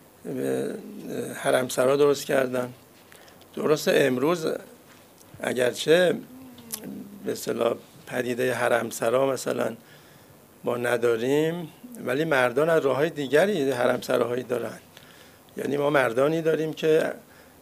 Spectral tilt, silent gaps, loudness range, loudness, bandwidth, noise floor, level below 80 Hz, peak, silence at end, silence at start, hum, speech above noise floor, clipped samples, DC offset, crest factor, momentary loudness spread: -4.5 dB/octave; none; 3 LU; -25 LUFS; 15.5 kHz; -52 dBFS; -70 dBFS; -6 dBFS; 0.4 s; 0.25 s; none; 28 dB; under 0.1%; under 0.1%; 18 dB; 14 LU